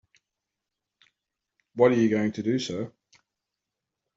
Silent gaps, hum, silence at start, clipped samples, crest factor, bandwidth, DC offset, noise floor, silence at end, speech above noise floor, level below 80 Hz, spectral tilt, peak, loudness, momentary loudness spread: none; none; 1.75 s; under 0.1%; 22 dB; 7.8 kHz; under 0.1%; -86 dBFS; 1.3 s; 62 dB; -68 dBFS; -5.5 dB/octave; -6 dBFS; -25 LUFS; 17 LU